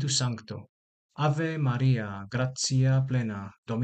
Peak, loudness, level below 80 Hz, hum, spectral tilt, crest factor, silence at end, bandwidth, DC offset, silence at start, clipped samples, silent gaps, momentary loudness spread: -14 dBFS; -28 LUFS; -60 dBFS; none; -5 dB/octave; 14 dB; 0 s; 9.2 kHz; under 0.1%; 0 s; under 0.1%; 0.69-1.09 s, 3.58-3.63 s; 13 LU